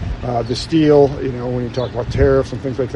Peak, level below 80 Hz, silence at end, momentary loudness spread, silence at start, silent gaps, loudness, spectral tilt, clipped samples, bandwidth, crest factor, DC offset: -2 dBFS; -30 dBFS; 0 s; 10 LU; 0 s; none; -17 LUFS; -7 dB/octave; under 0.1%; 10.5 kHz; 14 dB; under 0.1%